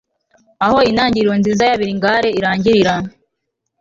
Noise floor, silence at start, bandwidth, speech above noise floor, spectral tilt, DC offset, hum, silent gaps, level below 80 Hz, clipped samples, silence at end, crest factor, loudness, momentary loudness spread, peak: -75 dBFS; 0.6 s; 7.6 kHz; 61 dB; -5.5 dB/octave; under 0.1%; none; none; -46 dBFS; under 0.1%; 0.7 s; 14 dB; -14 LUFS; 5 LU; -2 dBFS